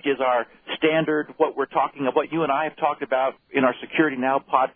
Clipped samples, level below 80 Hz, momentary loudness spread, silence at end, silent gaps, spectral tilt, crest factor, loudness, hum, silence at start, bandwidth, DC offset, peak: under 0.1%; -66 dBFS; 3 LU; 0.05 s; none; -9.5 dB/octave; 18 dB; -23 LUFS; none; 0 s; 3.7 kHz; under 0.1%; -4 dBFS